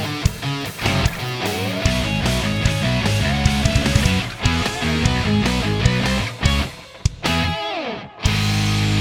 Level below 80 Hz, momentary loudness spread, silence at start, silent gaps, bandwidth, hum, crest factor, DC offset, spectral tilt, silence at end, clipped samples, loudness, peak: -28 dBFS; 6 LU; 0 s; none; 20 kHz; none; 18 dB; under 0.1%; -4.5 dB/octave; 0 s; under 0.1%; -20 LUFS; 0 dBFS